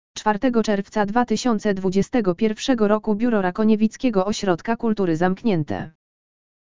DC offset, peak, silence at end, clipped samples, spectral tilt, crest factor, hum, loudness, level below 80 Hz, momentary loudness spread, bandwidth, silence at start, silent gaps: 2%; -4 dBFS; 0.7 s; under 0.1%; -6 dB/octave; 16 dB; none; -21 LUFS; -50 dBFS; 4 LU; 7.6 kHz; 0.15 s; none